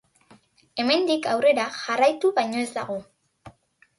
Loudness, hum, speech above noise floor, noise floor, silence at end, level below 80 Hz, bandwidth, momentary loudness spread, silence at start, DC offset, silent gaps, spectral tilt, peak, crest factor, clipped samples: -23 LUFS; none; 34 dB; -57 dBFS; 0.5 s; -68 dBFS; 11.5 kHz; 12 LU; 0.75 s; under 0.1%; none; -3.5 dB/octave; -8 dBFS; 16 dB; under 0.1%